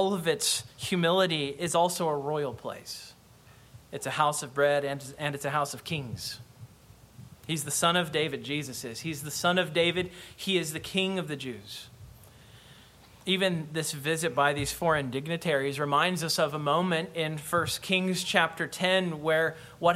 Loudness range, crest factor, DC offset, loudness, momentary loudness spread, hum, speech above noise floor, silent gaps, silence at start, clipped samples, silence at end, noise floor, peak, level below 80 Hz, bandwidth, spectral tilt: 5 LU; 22 dB; under 0.1%; -28 LUFS; 12 LU; none; 27 dB; none; 0 s; under 0.1%; 0 s; -55 dBFS; -8 dBFS; -62 dBFS; 16.5 kHz; -3.5 dB/octave